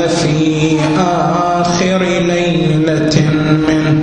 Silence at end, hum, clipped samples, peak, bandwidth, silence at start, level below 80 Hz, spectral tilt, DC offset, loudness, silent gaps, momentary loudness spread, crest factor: 0 s; none; under 0.1%; 0 dBFS; 10 kHz; 0 s; -38 dBFS; -6 dB/octave; under 0.1%; -13 LUFS; none; 1 LU; 12 dB